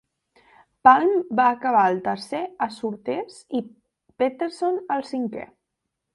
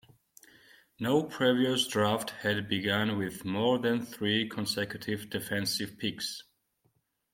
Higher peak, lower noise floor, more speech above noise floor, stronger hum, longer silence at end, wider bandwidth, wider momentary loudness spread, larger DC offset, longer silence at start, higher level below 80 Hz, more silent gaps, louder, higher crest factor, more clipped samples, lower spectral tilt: first, -2 dBFS vs -12 dBFS; first, -81 dBFS vs -74 dBFS; first, 59 dB vs 44 dB; neither; second, 0.7 s vs 0.9 s; second, 11.5 kHz vs 16.5 kHz; first, 14 LU vs 8 LU; neither; second, 0.85 s vs 1 s; about the same, -68 dBFS vs -70 dBFS; neither; first, -23 LUFS vs -30 LUFS; about the same, 22 dB vs 20 dB; neither; about the same, -5.5 dB/octave vs -4.5 dB/octave